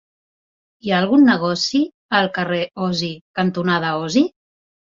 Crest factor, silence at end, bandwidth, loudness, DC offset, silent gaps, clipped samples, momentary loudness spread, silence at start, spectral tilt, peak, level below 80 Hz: 16 dB; 0.65 s; 7.6 kHz; -19 LUFS; under 0.1%; 1.94-2.09 s, 3.21-3.34 s; under 0.1%; 9 LU; 0.85 s; -5 dB/octave; -2 dBFS; -60 dBFS